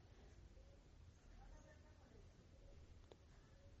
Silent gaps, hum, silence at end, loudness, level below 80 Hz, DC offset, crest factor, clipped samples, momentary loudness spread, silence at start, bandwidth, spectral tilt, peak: none; none; 0 s; -67 LUFS; -66 dBFS; under 0.1%; 18 dB; under 0.1%; 2 LU; 0 s; 8 kHz; -5.5 dB/octave; -46 dBFS